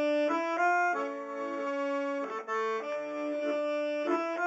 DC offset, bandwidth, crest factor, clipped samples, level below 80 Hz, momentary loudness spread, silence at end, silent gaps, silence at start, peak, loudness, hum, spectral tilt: under 0.1%; 7.8 kHz; 16 dB; under 0.1%; under -90 dBFS; 8 LU; 0 s; none; 0 s; -16 dBFS; -32 LUFS; none; -3.5 dB/octave